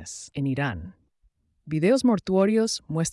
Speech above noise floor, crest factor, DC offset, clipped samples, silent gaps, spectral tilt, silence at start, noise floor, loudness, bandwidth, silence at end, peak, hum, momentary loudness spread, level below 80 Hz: 43 dB; 16 dB; under 0.1%; under 0.1%; none; -5.5 dB/octave; 0 s; -67 dBFS; -24 LUFS; 12 kHz; 0 s; -10 dBFS; none; 14 LU; -56 dBFS